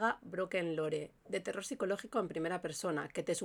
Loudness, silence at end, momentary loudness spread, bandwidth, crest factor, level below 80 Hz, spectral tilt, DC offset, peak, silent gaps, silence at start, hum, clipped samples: -38 LUFS; 0 s; 5 LU; 19.5 kHz; 20 dB; -74 dBFS; -4.5 dB/octave; under 0.1%; -18 dBFS; none; 0 s; none; under 0.1%